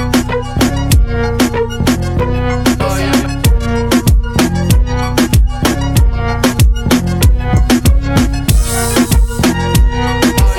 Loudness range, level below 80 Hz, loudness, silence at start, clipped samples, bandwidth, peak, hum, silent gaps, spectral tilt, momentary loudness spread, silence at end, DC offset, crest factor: 2 LU; -14 dBFS; -13 LUFS; 0 s; under 0.1%; 18.5 kHz; 0 dBFS; none; none; -5.5 dB/octave; 3 LU; 0 s; under 0.1%; 10 dB